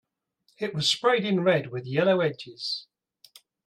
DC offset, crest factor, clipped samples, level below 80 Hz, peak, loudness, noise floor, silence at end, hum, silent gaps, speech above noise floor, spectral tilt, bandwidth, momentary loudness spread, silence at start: under 0.1%; 18 dB; under 0.1%; -74 dBFS; -10 dBFS; -25 LUFS; -70 dBFS; 0.85 s; none; none; 45 dB; -4.5 dB/octave; 15 kHz; 11 LU; 0.6 s